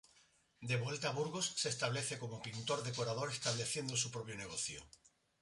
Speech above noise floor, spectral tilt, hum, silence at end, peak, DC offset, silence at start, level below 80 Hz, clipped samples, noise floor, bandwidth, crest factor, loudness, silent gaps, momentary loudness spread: 31 dB; -3 dB/octave; none; 0.55 s; -22 dBFS; under 0.1%; 0.6 s; -72 dBFS; under 0.1%; -71 dBFS; 11.5 kHz; 20 dB; -39 LUFS; none; 7 LU